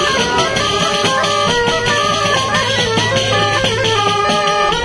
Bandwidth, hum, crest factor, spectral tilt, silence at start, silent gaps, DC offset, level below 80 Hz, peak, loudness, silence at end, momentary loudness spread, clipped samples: 11 kHz; none; 14 dB; -3 dB/octave; 0 s; none; under 0.1%; -38 dBFS; -2 dBFS; -13 LUFS; 0 s; 1 LU; under 0.1%